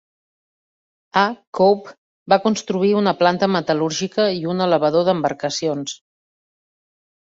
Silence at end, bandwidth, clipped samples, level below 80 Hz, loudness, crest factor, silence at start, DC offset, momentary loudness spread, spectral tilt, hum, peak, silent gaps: 1.4 s; 8 kHz; under 0.1%; -62 dBFS; -19 LUFS; 18 dB; 1.15 s; under 0.1%; 6 LU; -5 dB/octave; none; -2 dBFS; 1.47-1.53 s, 1.98-2.26 s